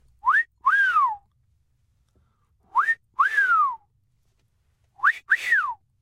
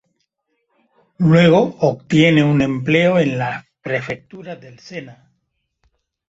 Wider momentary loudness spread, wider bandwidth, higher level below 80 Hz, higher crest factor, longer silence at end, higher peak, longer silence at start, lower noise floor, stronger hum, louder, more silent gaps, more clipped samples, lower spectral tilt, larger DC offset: second, 8 LU vs 21 LU; first, 16 kHz vs 8 kHz; second, -68 dBFS vs -52 dBFS; about the same, 16 dB vs 18 dB; second, 0.3 s vs 1.2 s; second, -8 dBFS vs 0 dBFS; second, 0.25 s vs 1.2 s; about the same, -68 dBFS vs -71 dBFS; neither; second, -21 LUFS vs -15 LUFS; neither; neither; second, 0.5 dB/octave vs -7 dB/octave; neither